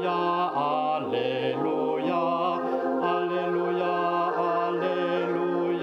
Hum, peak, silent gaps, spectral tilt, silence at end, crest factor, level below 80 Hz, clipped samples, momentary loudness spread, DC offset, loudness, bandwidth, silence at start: none; -12 dBFS; none; -7.5 dB/octave; 0 s; 14 dB; -74 dBFS; under 0.1%; 2 LU; under 0.1%; -26 LUFS; 6.4 kHz; 0 s